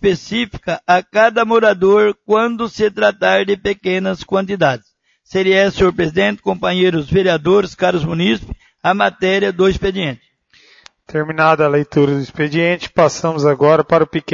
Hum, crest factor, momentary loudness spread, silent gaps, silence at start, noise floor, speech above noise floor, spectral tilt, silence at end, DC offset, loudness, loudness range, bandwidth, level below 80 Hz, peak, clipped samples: none; 14 dB; 8 LU; none; 0 s; -51 dBFS; 36 dB; -6 dB/octave; 0 s; under 0.1%; -15 LUFS; 3 LU; 7.6 kHz; -42 dBFS; 0 dBFS; under 0.1%